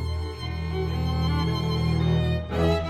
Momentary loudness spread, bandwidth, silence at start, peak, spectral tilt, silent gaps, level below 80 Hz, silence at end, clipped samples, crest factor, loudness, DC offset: 8 LU; 12.5 kHz; 0 s; -10 dBFS; -7.5 dB/octave; none; -36 dBFS; 0 s; under 0.1%; 14 dB; -26 LUFS; under 0.1%